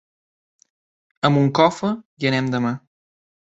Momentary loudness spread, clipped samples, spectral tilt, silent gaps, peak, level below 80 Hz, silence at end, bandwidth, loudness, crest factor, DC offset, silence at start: 9 LU; under 0.1%; -6.5 dB/octave; 2.05-2.17 s; -2 dBFS; -62 dBFS; 0.75 s; 8 kHz; -20 LUFS; 20 dB; under 0.1%; 1.25 s